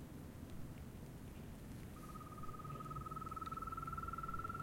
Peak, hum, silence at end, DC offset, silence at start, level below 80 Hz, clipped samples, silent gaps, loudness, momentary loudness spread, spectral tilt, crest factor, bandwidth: -32 dBFS; none; 0 s; under 0.1%; 0 s; -58 dBFS; under 0.1%; none; -49 LUFS; 8 LU; -6.5 dB/octave; 16 dB; 16.5 kHz